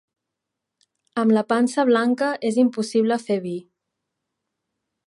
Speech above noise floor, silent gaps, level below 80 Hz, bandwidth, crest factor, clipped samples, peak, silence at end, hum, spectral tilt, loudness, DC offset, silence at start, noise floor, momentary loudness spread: 63 dB; none; -76 dBFS; 11.5 kHz; 18 dB; under 0.1%; -6 dBFS; 1.45 s; none; -5.5 dB/octave; -21 LUFS; under 0.1%; 1.15 s; -83 dBFS; 9 LU